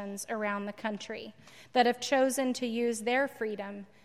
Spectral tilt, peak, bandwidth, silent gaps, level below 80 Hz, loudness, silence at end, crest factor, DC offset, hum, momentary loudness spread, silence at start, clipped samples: -3.5 dB/octave; -14 dBFS; 15.5 kHz; none; -78 dBFS; -31 LUFS; 0.2 s; 18 dB; under 0.1%; none; 13 LU; 0 s; under 0.1%